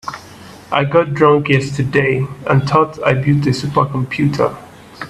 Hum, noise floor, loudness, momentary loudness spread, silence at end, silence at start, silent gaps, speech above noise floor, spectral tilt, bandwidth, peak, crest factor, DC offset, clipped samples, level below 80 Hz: none; -37 dBFS; -15 LUFS; 7 LU; 0 s; 0.05 s; none; 23 dB; -7 dB/octave; 11.5 kHz; 0 dBFS; 16 dB; under 0.1%; under 0.1%; -46 dBFS